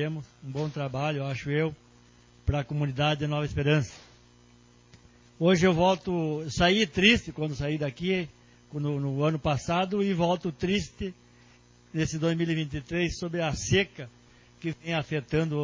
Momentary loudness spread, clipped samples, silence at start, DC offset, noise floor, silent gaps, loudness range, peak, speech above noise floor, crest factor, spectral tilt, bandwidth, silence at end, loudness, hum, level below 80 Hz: 13 LU; under 0.1%; 0 s; under 0.1%; -57 dBFS; none; 5 LU; -6 dBFS; 30 dB; 22 dB; -5.5 dB/octave; 7.6 kHz; 0 s; -28 LUFS; 60 Hz at -55 dBFS; -48 dBFS